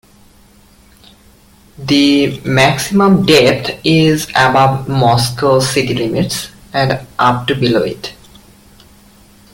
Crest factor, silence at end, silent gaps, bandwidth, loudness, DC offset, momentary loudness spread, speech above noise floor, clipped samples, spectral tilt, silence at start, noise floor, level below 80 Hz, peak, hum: 14 dB; 1.4 s; none; 17 kHz; -12 LUFS; under 0.1%; 8 LU; 33 dB; under 0.1%; -5 dB/octave; 1.8 s; -45 dBFS; -44 dBFS; 0 dBFS; none